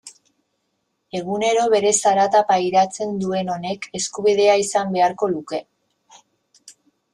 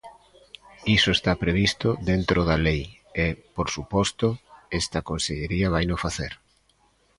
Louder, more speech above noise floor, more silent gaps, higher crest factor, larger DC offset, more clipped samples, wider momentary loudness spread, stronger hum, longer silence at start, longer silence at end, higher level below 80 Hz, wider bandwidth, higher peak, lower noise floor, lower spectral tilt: first, -19 LUFS vs -24 LUFS; first, 54 dB vs 40 dB; neither; about the same, 16 dB vs 20 dB; neither; neither; about the same, 11 LU vs 11 LU; neither; about the same, 0.05 s vs 0.05 s; second, 0.4 s vs 0.85 s; second, -64 dBFS vs -38 dBFS; about the same, 12.5 kHz vs 11.5 kHz; about the same, -4 dBFS vs -6 dBFS; first, -72 dBFS vs -64 dBFS; second, -3.5 dB/octave vs -5 dB/octave